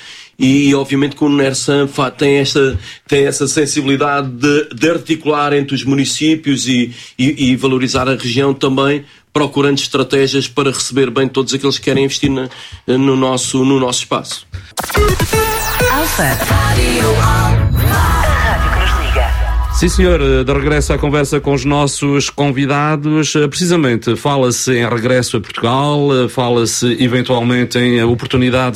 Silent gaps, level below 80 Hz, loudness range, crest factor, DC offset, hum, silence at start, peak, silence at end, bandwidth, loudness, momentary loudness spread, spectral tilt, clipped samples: none; -24 dBFS; 2 LU; 12 dB; under 0.1%; none; 0 s; 0 dBFS; 0 s; 16.5 kHz; -13 LUFS; 4 LU; -5 dB/octave; under 0.1%